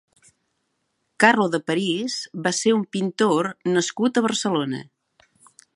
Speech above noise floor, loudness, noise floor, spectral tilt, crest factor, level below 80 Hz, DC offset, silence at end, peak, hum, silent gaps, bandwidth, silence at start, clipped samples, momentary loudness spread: 52 dB; -22 LUFS; -73 dBFS; -4 dB/octave; 22 dB; -72 dBFS; under 0.1%; 0.9 s; 0 dBFS; none; none; 11.5 kHz; 1.2 s; under 0.1%; 8 LU